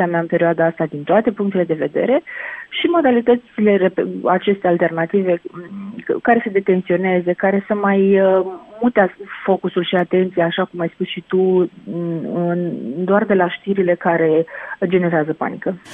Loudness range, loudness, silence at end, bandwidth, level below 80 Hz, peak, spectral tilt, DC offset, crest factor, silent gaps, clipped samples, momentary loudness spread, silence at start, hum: 2 LU; -18 LUFS; 0 s; 3.9 kHz; -62 dBFS; 0 dBFS; -9 dB/octave; under 0.1%; 16 dB; none; under 0.1%; 9 LU; 0 s; none